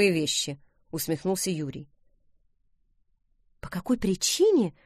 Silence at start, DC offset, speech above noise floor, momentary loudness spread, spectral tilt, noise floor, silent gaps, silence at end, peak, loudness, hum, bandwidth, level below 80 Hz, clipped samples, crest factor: 0 s; under 0.1%; 42 dB; 17 LU; -4 dB/octave; -68 dBFS; none; 0.15 s; -10 dBFS; -26 LUFS; none; 15.5 kHz; -56 dBFS; under 0.1%; 18 dB